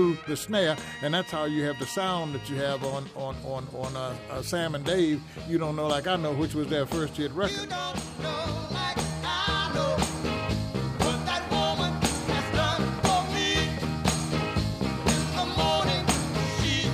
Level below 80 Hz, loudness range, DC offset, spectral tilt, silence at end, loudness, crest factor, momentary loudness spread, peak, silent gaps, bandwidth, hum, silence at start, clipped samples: -42 dBFS; 4 LU; under 0.1%; -4.5 dB/octave; 0 s; -28 LUFS; 16 dB; 8 LU; -12 dBFS; none; 15.5 kHz; none; 0 s; under 0.1%